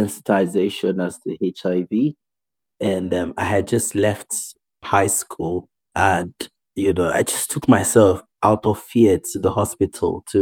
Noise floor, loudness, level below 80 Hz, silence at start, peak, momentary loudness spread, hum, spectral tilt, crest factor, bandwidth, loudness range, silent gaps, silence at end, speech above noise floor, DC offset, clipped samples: -89 dBFS; -20 LUFS; -50 dBFS; 0 s; -2 dBFS; 10 LU; none; -5 dB/octave; 18 dB; over 20 kHz; 5 LU; none; 0 s; 69 dB; under 0.1%; under 0.1%